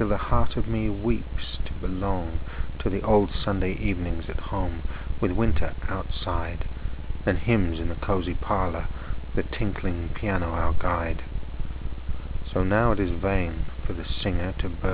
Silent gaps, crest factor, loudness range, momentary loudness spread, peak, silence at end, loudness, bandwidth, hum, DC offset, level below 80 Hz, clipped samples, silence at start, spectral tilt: none; 18 dB; 2 LU; 11 LU; -6 dBFS; 0 s; -28 LUFS; 4 kHz; none; 0.8%; -32 dBFS; under 0.1%; 0 s; -11 dB/octave